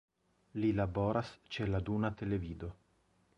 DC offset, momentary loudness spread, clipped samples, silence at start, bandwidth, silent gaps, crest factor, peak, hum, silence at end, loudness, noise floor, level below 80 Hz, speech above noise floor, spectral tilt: under 0.1%; 12 LU; under 0.1%; 0.55 s; 7.6 kHz; none; 18 dB; -18 dBFS; none; 0.65 s; -36 LUFS; -73 dBFS; -52 dBFS; 37 dB; -8.5 dB/octave